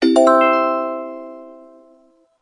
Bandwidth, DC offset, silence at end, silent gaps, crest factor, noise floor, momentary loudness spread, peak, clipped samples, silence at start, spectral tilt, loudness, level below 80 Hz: 11.5 kHz; under 0.1%; 0.9 s; none; 16 dB; -54 dBFS; 23 LU; -2 dBFS; under 0.1%; 0 s; -3 dB/octave; -15 LUFS; -68 dBFS